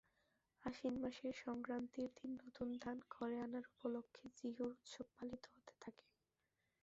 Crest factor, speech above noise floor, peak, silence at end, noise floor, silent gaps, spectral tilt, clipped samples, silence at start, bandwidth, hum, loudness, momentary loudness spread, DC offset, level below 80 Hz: 18 dB; 41 dB; -32 dBFS; 0.9 s; -89 dBFS; none; -4.5 dB/octave; under 0.1%; 0.6 s; 7.6 kHz; none; -49 LUFS; 12 LU; under 0.1%; -78 dBFS